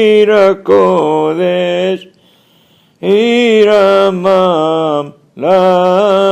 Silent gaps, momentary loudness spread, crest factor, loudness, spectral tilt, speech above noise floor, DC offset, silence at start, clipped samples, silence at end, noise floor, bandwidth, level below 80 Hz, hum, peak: none; 9 LU; 10 dB; -10 LUFS; -6 dB/octave; 40 dB; under 0.1%; 0 s; 0.2%; 0 s; -49 dBFS; 10 kHz; -58 dBFS; none; 0 dBFS